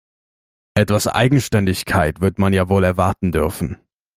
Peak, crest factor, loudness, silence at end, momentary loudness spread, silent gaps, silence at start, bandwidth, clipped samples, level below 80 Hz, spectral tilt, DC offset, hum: -2 dBFS; 16 dB; -18 LUFS; 0.4 s; 7 LU; none; 0.75 s; 16 kHz; under 0.1%; -40 dBFS; -6 dB/octave; under 0.1%; none